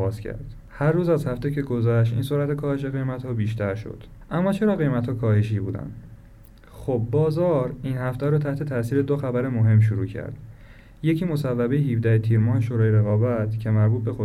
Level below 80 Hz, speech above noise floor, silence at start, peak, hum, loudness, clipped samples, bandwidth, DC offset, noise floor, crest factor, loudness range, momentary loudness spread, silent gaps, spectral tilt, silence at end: -46 dBFS; 25 dB; 0 s; -8 dBFS; none; -23 LUFS; under 0.1%; 12 kHz; under 0.1%; -47 dBFS; 14 dB; 3 LU; 13 LU; none; -9.5 dB/octave; 0 s